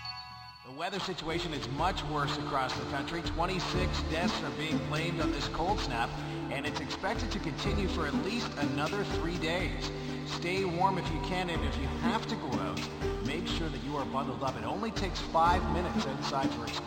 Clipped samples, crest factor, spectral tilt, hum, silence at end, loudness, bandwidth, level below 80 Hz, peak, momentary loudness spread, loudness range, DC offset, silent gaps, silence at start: under 0.1%; 18 dB; -5 dB/octave; none; 0 s; -33 LUFS; 16 kHz; -42 dBFS; -14 dBFS; 5 LU; 2 LU; under 0.1%; none; 0 s